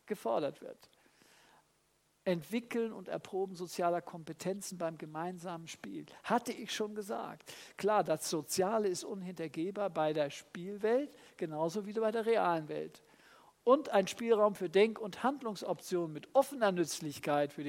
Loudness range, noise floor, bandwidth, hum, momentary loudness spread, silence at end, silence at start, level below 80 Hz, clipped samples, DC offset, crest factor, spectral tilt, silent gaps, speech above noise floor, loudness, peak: 7 LU; -74 dBFS; 16 kHz; none; 14 LU; 0 s; 0.05 s; -80 dBFS; under 0.1%; under 0.1%; 22 dB; -4.5 dB/octave; none; 39 dB; -35 LUFS; -14 dBFS